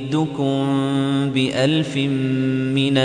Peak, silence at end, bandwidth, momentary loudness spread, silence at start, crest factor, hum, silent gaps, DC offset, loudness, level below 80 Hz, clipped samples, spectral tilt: -4 dBFS; 0 s; 10 kHz; 3 LU; 0 s; 14 dB; none; none; under 0.1%; -20 LUFS; -58 dBFS; under 0.1%; -6.5 dB/octave